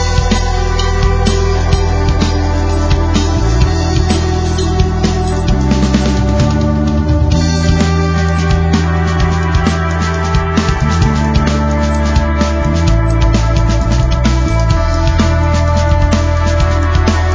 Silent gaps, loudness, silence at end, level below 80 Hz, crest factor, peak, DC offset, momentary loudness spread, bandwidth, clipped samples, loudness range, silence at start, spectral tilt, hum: none; -13 LUFS; 0 s; -14 dBFS; 12 dB; 0 dBFS; under 0.1%; 2 LU; 8 kHz; under 0.1%; 1 LU; 0 s; -6 dB/octave; none